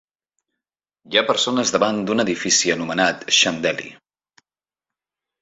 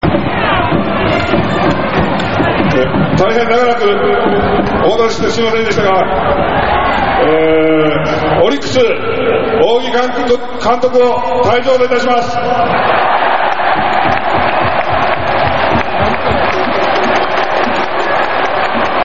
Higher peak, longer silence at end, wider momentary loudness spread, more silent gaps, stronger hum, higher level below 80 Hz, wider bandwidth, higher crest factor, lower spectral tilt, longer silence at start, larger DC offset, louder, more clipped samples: about the same, -2 dBFS vs 0 dBFS; first, 1.45 s vs 0 s; first, 7 LU vs 3 LU; neither; neither; second, -62 dBFS vs -32 dBFS; about the same, 8 kHz vs 7.8 kHz; first, 20 dB vs 12 dB; second, -2 dB/octave vs -3.5 dB/octave; first, 1.1 s vs 0 s; second, under 0.1% vs 9%; second, -18 LUFS vs -12 LUFS; neither